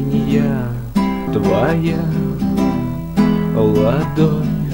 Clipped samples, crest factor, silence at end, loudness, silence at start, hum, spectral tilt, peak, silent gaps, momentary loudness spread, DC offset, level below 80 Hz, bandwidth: under 0.1%; 14 dB; 0 s; -17 LUFS; 0 s; none; -8.5 dB/octave; -2 dBFS; none; 4 LU; under 0.1%; -34 dBFS; 16.5 kHz